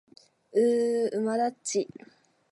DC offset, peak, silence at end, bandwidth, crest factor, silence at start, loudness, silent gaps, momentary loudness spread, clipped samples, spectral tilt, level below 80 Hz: under 0.1%; -14 dBFS; 0.7 s; 11.5 kHz; 16 dB; 0.55 s; -27 LUFS; none; 7 LU; under 0.1%; -4 dB/octave; -82 dBFS